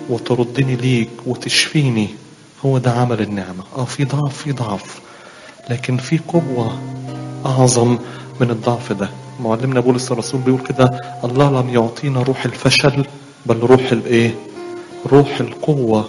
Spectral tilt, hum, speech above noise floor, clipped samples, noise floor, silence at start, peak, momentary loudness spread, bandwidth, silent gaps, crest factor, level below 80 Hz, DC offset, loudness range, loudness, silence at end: -5.5 dB/octave; none; 23 dB; under 0.1%; -39 dBFS; 0 s; 0 dBFS; 14 LU; 11.5 kHz; none; 16 dB; -50 dBFS; under 0.1%; 6 LU; -17 LUFS; 0 s